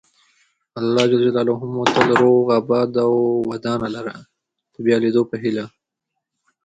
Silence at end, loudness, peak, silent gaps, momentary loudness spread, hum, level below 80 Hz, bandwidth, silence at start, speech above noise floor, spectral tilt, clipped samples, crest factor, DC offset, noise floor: 1 s; -18 LUFS; 0 dBFS; none; 12 LU; none; -60 dBFS; 9 kHz; 0.75 s; 62 dB; -6 dB/octave; under 0.1%; 18 dB; under 0.1%; -80 dBFS